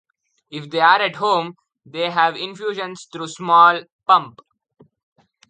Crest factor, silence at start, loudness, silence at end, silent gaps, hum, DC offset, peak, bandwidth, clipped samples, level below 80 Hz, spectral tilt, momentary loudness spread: 20 dB; 0.5 s; -17 LUFS; 1.2 s; 3.92-3.99 s; none; under 0.1%; 0 dBFS; 9.4 kHz; under 0.1%; -74 dBFS; -3.5 dB/octave; 20 LU